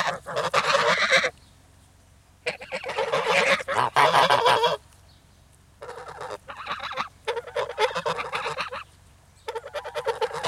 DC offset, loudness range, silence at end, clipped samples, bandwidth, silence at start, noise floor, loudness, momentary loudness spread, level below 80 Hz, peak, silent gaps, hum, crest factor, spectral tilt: under 0.1%; 8 LU; 0 s; under 0.1%; 16 kHz; 0 s; -55 dBFS; -24 LUFS; 18 LU; -60 dBFS; -6 dBFS; none; none; 20 dB; -2 dB/octave